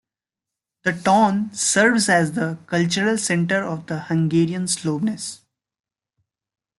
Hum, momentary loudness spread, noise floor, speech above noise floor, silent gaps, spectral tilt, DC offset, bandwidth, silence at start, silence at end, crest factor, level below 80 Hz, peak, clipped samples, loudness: none; 10 LU; -87 dBFS; 68 dB; none; -4.5 dB/octave; under 0.1%; 12 kHz; 0.85 s; 1.45 s; 18 dB; -62 dBFS; -4 dBFS; under 0.1%; -20 LUFS